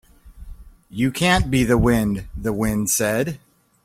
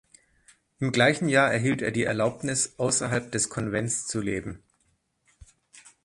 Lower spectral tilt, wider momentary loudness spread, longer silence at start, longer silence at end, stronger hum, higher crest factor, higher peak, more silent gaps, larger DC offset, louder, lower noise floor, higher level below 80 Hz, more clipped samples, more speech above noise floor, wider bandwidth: about the same, -4.5 dB/octave vs -4 dB/octave; about the same, 10 LU vs 10 LU; second, 0.25 s vs 0.8 s; first, 0.5 s vs 0.25 s; neither; second, 16 dB vs 22 dB; about the same, -4 dBFS vs -6 dBFS; neither; neither; first, -20 LUFS vs -25 LUFS; second, -40 dBFS vs -71 dBFS; first, -34 dBFS vs -56 dBFS; neither; second, 20 dB vs 45 dB; first, 16.5 kHz vs 11.5 kHz